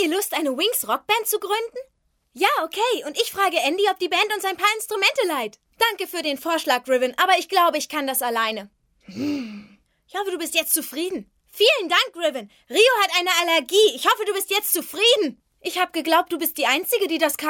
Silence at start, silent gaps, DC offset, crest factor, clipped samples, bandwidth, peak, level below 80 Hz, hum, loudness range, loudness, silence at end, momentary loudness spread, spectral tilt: 0 s; none; under 0.1%; 20 dB; under 0.1%; 18 kHz; -2 dBFS; -70 dBFS; none; 5 LU; -21 LUFS; 0 s; 11 LU; -0.5 dB/octave